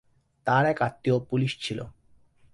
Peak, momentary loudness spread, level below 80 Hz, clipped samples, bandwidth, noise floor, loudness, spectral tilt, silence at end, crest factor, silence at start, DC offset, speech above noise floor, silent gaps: -10 dBFS; 12 LU; -60 dBFS; under 0.1%; 11.5 kHz; -58 dBFS; -27 LUFS; -6.5 dB/octave; 0.65 s; 18 dB; 0.45 s; under 0.1%; 33 dB; none